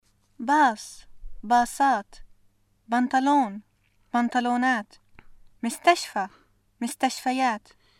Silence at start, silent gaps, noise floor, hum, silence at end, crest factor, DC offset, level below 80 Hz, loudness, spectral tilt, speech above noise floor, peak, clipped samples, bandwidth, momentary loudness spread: 0.4 s; none; -63 dBFS; none; 0.4 s; 20 dB; under 0.1%; -52 dBFS; -25 LUFS; -3 dB/octave; 39 dB; -8 dBFS; under 0.1%; 16 kHz; 14 LU